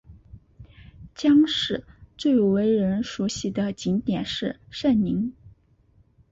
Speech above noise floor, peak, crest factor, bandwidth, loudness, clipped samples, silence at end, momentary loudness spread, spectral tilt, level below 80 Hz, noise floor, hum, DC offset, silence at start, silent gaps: 37 dB; -10 dBFS; 16 dB; 8 kHz; -24 LUFS; under 0.1%; 0.8 s; 10 LU; -6 dB/octave; -52 dBFS; -60 dBFS; none; under 0.1%; 0.1 s; none